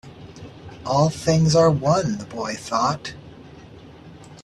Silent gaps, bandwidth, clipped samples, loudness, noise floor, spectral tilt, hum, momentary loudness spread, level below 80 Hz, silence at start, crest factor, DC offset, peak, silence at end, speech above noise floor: none; 12 kHz; under 0.1%; -20 LUFS; -43 dBFS; -6 dB/octave; none; 24 LU; -50 dBFS; 0.05 s; 18 dB; under 0.1%; -6 dBFS; 0.05 s; 23 dB